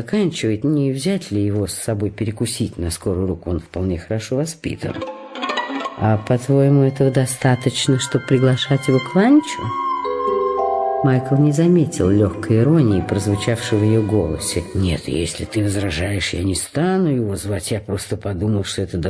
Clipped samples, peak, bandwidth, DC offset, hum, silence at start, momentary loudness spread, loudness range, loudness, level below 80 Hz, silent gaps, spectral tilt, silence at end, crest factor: under 0.1%; -4 dBFS; 11 kHz; under 0.1%; none; 0 s; 9 LU; 6 LU; -19 LUFS; -42 dBFS; none; -6 dB/octave; 0 s; 14 dB